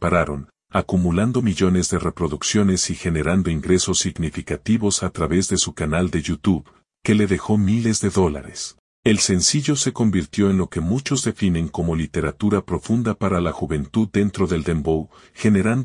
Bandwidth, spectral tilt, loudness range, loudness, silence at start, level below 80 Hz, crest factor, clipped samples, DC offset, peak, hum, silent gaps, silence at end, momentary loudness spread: 11 kHz; -5 dB/octave; 2 LU; -20 LUFS; 0 s; -42 dBFS; 18 dB; under 0.1%; under 0.1%; -2 dBFS; none; 8.79-9.03 s; 0 s; 7 LU